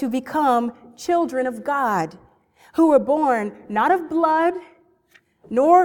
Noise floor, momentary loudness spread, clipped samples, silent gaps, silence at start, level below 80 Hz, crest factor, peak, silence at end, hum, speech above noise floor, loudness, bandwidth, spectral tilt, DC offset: -58 dBFS; 11 LU; under 0.1%; none; 0 s; -64 dBFS; 18 dB; -2 dBFS; 0 s; none; 39 dB; -20 LUFS; 18 kHz; -6 dB/octave; under 0.1%